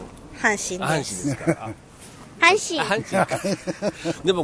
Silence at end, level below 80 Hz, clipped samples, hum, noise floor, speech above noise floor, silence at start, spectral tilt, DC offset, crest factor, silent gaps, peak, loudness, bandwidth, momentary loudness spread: 0 s; -52 dBFS; under 0.1%; none; -43 dBFS; 21 dB; 0 s; -3.5 dB/octave; under 0.1%; 22 dB; none; -2 dBFS; -22 LUFS; 11 kHz; 20 LU